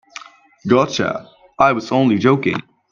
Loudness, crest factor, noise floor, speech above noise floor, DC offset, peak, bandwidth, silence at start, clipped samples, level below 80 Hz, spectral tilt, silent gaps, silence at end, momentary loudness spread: -17 LUFS; 18 dB; -39 dBFS; 24 dB; under 0.1%; 0 dBFS; 7.4 kHz; 0.2 s; under 0.1%; -56 dBFS; -6 dB/octave; none; 0.3 s; 16 LU